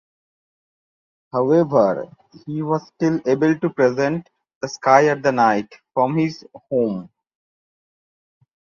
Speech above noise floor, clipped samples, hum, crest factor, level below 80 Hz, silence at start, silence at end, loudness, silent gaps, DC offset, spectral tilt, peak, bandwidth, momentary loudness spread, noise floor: over 71 dB; under 0.1%; none; 20 dB; -64 dBFS; 1.35 s; 1.7 s; -19 LUFS; 4.55-4.61 s; under 0.1%; -7 dB/octave; 0 dBFS; 7.2 kHz; 15 LU; under -90 dBFS